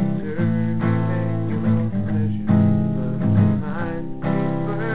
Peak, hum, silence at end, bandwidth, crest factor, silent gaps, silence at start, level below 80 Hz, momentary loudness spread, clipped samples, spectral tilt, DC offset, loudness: -4 dBFS; none; 0 s; 4 kHz; 16 dB; none; 0 s; -44 dBFS; 6 LU; under 0.1%; -13 dB/octave; 3%; -21 LUFS